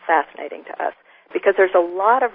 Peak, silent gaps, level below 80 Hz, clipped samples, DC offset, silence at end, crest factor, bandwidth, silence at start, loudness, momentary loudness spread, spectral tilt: -2 dBFS; none; -68 dBFS; under 0.1%; under 0.1%; 0.05 s; 16 dB; 3.8 kHz; 0.05 s; -19 LUFS; 14 LU; -8 dB/octave